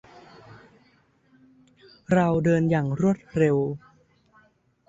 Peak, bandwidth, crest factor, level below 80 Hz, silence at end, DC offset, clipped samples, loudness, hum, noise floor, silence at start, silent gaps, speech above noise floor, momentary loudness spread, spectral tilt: -8 dBFS; 8 kHz; 18 dB; -56 dBFS; 1.1 s; under 0.1%; under 0.1%; -23 LUFS; none; -62 dBFS; 0.5 s; none; 40 dB; 5 LU; -8.5 dB/octave